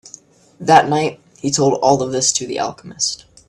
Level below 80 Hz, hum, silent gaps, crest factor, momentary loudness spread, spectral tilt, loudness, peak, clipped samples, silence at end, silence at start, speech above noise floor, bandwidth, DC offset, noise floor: -56 dBFS; none; none; 18 dB; 12 LU; -3.5 dB/octave; -17 LUFS; 0 dBFS; under 0.1%; 0.3 s; 0.6 s; 28 dB; 13 kHz; under 0.1%; -44 dBFS